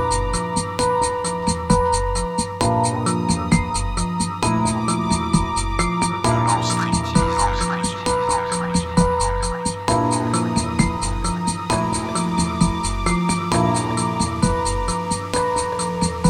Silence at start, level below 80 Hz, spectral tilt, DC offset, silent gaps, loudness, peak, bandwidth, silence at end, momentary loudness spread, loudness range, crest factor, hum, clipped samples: 0 s; -30 dBFS; -5 dB/octave; under 0.1%; none; -20 LUFS; -4 dBFS; 13.5 kHz; 0 s; 4 LU; 1 LU; 16 dB; none; under 0.1%